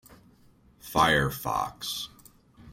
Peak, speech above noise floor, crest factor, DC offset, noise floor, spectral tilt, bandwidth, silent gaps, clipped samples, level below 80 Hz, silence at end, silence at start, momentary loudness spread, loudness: -8 dBFS; 32 dB; 22 dB; under 0.1%; -59 dBFS; -4 dB/octave; 16.5 kHz; none; under 0.1%; -50 dBFS; 0 s; 0.1 s; 15 LU; -27 LUFS